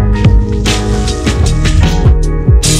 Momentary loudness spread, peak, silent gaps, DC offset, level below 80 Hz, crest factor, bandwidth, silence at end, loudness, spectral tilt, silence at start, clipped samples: 3 LU; 0 dBFS; none; under 0.1%; -12 dBFS; 8 dB; 14.5 kHz; 0 s; -11 LUFS; -5 dB/octave; 0 s; under 0.1%